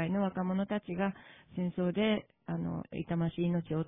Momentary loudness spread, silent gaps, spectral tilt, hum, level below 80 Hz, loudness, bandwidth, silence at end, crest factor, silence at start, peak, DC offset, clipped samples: 8 LU; none; -11 dB/octave; none; -62 dBFS; -34 LUFS; 3.8 kHz; 0 s; 16 dB; 0 s; -18 dBFS; under 0.1%; under 0.1%